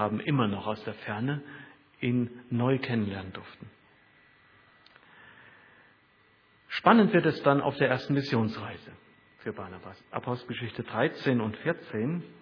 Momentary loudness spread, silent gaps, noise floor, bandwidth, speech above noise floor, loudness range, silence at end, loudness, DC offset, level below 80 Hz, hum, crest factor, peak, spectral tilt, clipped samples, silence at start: 18 LU; none; -63 dBFS; 5.4 kHz; 35 dB; 8 LU; 0.1 s; -29 LUFS; under 0.1%; -68 dBFS; none; 26 dB; -4 dBFS; -8.5 dB/octave; under 0.1%; 0 s